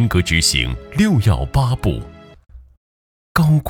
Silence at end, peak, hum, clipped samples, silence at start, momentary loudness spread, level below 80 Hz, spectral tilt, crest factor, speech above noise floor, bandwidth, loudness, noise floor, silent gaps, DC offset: 0 s; 0 dBFS; none; under 0.1%; 0 s; 8 LU; -30 dBFS; -5 dB/octave; 18 dB; over 74 dB; 17.5 kHz; -17 LUFS; under -90 dBFS; 2.77-3.35 s; under 0.1%